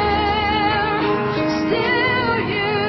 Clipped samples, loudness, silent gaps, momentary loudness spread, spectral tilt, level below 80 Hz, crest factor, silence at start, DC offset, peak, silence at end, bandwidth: under 0.1%; -18 LUFS; none; 3 LU; -6.5 dB/octave; -38 dBFS; 12 dB; 0 s; under 0.1%; -6 dBFS; 0 s; 6 kHz